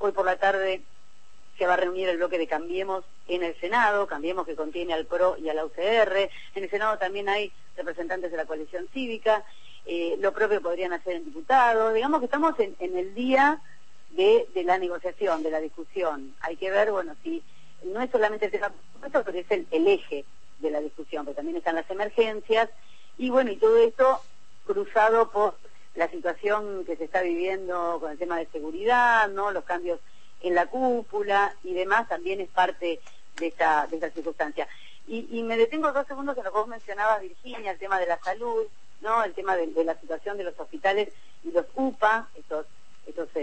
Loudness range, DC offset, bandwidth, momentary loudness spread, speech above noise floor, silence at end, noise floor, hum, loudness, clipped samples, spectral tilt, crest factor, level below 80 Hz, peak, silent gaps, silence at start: 5 LU; 1%; 8.6 kHz; 13 LU; 34 dB; 0 s; -60 dBFS; none; -26 LUFS; under 0.1%; -4.5 dB/octave; 18 dB; -62 dBFS; -8 dBFS; none; 0 s